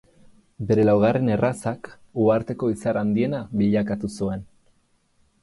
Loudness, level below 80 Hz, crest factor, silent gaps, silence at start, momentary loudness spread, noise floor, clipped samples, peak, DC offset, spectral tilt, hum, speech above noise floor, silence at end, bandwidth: -22 LUFS; -52 dBFS; 16 dB; none; 0.6 s; 12 LU; -64 dBFS; under 0.1%; -8 dBFS; under 0.1%; -8 dB/octave; none; 42 dB; 1 s; 11.5 kHz